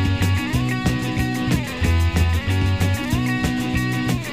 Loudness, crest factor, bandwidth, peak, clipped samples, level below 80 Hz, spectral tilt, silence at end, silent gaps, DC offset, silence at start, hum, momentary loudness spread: -21 LUFS; 14 dB; 15.5 kHz; -6 dBFS; under 0.1%; -30 dBFS; -6 dB/octave; 0 s; none; 0.6%; 0 s; none; 3 LU